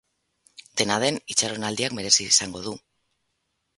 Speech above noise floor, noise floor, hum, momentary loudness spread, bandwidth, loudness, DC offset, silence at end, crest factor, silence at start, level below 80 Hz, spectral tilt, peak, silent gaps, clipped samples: 52 dB; -76 dBFS; none; 16 LU; 12 kHz; -22 LUFS; under 0.1%; 1 s; 24 dB; 0.75 s; -62 dBFS; -1.5 dB/octave; -2 dBFS; none; under 0.1%